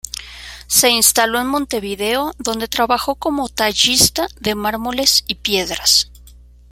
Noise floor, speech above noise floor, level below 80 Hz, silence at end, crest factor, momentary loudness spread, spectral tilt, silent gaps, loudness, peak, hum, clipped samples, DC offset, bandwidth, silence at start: -43 dBFS; 26 dB; -42 dBFS; 0.4 s; 18 dB; 11 LU; -1 dB/octave; none; -15 LUFS; 0 dBFS; 60 Hz at -40 dBFS; under 0.1%; under 0.1%; 17 kHz; 0.05 s